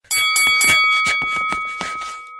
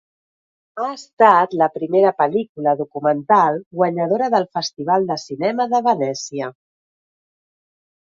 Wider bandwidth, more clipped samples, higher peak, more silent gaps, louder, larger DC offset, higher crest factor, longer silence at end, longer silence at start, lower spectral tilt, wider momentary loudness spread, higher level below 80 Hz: first, over 20 kHz vs 7.6 kHz; neither; about the same, -2 dBFS vs 0 dBFS; second, none vs 1.13-1.17 s, 2.49-2.55 s, 3.66-3.71 s; first, -15 LUFS vs -18 LUFS; neither; about the same, 16 dB vs 20 dB; second, 0 s vs 1.6 s; second, 0.1 s vs 0.75 s; second, 1 dB/octave vs -5 dB/octave; about the same, 13 LU vs 11 LU; first, -52 dBFS vs -70 dBFS